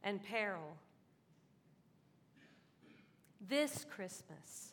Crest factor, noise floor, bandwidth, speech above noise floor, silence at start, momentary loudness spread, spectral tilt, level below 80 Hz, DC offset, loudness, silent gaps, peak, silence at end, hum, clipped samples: 22 dB; -71 dBFS; 18 kHz; 28 dB; 0 s; 17 LU; -3.5 dB/octave; under -90 dBFS; under 0.1%; -42 LUFS; none; -24 dBFS; 0 s; none; under 0.1%